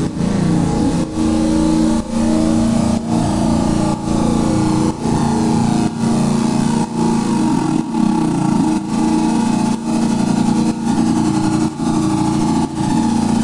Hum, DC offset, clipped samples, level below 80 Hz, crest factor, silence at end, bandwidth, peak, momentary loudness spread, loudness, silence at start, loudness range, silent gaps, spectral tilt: none; under 0.1%; under 0.1%; -34 dBFS; 12 dB; 0 s; 11.5 kHz; -2 dBFS; 2 LU; -16 LUFS; 0 s; 0 LU; none; -6.5 dB/octave